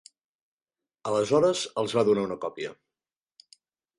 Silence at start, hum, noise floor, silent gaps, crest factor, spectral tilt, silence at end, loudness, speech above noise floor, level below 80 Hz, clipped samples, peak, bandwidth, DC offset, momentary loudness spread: 1.05 s; none; under -90 dBFS; none; 20 dB; -5 dB/octave; 1.25 s; -26 LUFS; over 65 dB; -68 dBFS; under 0.1%; -10 dBFS; 11.5 kHz; under 0.1%; 15 LU